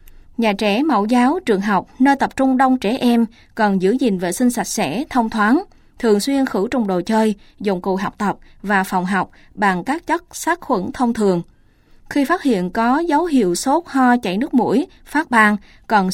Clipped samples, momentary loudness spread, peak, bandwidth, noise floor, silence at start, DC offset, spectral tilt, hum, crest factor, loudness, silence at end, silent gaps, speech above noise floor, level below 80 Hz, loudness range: under 0.1%; 6 LU; 0 dBFS; 16.5 kHz; -50 dBFS; 0.4 s; under 0.1%; -5 dB/octave; none; 18 dB; -18 LUFS; 0 s; none; 32 dB; -48 dBFS; 4 LU